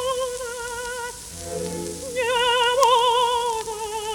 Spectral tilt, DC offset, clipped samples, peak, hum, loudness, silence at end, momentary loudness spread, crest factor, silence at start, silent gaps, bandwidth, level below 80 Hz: -1.5 dB/octave; under 0.1%; under 0.1%; -2 dBFS; none; -22 LUFS; 0 s; 14 LU; 20 dB; 0 s; none; 19 kHz; -50 dBFS